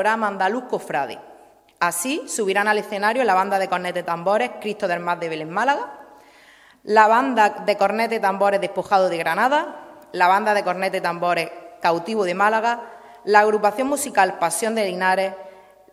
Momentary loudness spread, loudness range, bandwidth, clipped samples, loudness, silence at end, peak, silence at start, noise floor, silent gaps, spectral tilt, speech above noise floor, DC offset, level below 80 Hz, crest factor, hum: 10 LU; 3 LU; 16 kHz; under 0.1%; -20 LUFS; 0.4 s; 0 dBFS; 0 s; -51 dBFS; none; -3.5 dB/octave; 30 dB; under 0.1%; -70 dBFS; 20 dB; none